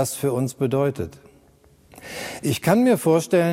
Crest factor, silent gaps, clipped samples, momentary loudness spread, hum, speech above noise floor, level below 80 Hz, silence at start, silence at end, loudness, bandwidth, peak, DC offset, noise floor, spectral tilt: 18 dB; none; under 0.1%; 16 LU; none; 34 dB; -56 dBFS; 0 s; 0 s; -21 LUFS; 16.5 kHz; -4 dBFS; under 0.1%; -55 dBFS; -6 dB/octave